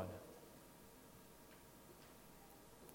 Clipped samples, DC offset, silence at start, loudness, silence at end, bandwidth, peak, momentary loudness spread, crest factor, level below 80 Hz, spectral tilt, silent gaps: under 0.1%; under 0.1%; 0 s; -60 LUFS; 0 s; 16.5 kHz; -32 dBFS; 5 LU; 24 dB; -74 dBFS; -5 dB/octave; none